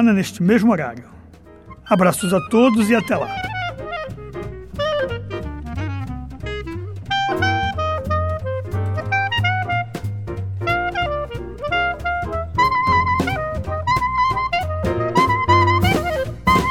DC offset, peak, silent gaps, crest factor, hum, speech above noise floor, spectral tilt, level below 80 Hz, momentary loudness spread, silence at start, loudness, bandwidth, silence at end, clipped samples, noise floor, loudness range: 0.5%; -2 dBFS; none; 18 dB; none; 27 dB; -6 dB/octave; -36 dBFS; 14 LU; 0 s; -20 LUFS; 17.5 kHz; 0 s; under 0.1%; -43 dBFS; 7 LU